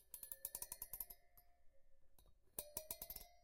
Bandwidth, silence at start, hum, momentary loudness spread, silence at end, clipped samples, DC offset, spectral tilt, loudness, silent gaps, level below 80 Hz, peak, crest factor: 17 kHz; 0 s; none; 4 LU; 0 s; under 0.1%; under 0.1%; -1 dB/octave; -51 LUFS; none; -70 dBFS; -26 dBFS; 30 dB